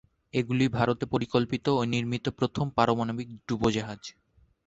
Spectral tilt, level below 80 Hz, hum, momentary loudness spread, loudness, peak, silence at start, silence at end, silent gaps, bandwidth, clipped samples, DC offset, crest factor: -6.5 dB/octave; -54 dBFS; none; 9 LU; -28 LUFS; -6 dBFS; 0.35 s; 0.55 s; none; 8 kHz; under 0.1%; under 0.1%; 22 dB